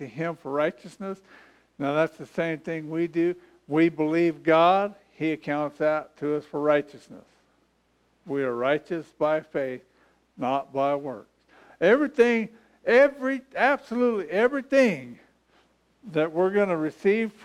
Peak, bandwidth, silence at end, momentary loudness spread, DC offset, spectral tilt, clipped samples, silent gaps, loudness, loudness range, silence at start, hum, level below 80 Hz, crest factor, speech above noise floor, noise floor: -8 dBFS; 11.5 kHz; 0.15 s; 13 LU; under 0.1%; -6.5 dB/octave; under 0.1%; none; -25 LUFS; 6 LU; 0 s; none; -70 dBFS; 18 dB; 43 dB; -67 dBFS